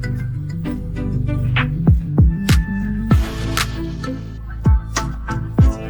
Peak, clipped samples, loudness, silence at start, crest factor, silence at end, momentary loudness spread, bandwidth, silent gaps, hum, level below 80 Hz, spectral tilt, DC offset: -2 dBFS; under 0.1%; -19 LUFS; 0 s; 16 dB; 0 s; 10 LU; over 20 kHz; none; none; -22 dBFS; -6 dB/octave; under 0.1%